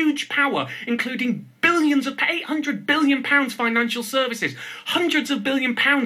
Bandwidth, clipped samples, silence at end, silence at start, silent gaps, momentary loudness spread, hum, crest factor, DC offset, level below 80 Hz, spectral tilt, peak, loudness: 15 kHz; under 0.1%; 0 s; 0 s; none; 7 LU; none; 18 dB; under 0.1%; -72 dBFS; -3.5 dB/octave; -4 dBFS; -21 LUFS